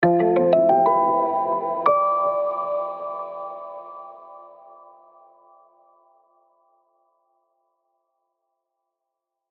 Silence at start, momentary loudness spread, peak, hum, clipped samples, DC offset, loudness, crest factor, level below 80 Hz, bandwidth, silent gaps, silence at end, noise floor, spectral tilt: 0 s; 21 LU; -4 dBFS; none; under 0.1%; under 0.1%; -20 LUFS; 22 dB; -68 dBFS; 4.6 kHz; none; 5 s; -83 dBFS; -10 dB/octave